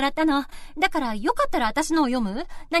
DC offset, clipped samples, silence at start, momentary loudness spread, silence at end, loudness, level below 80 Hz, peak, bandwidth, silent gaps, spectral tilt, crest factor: under 0.1%; under 0.1%; 0 s; 6 LU; 0 s; -24 LUFS; -40 dBFS; -8 dBFS; 13.5 kHz; none; -3.5 dB/octave; 16 dB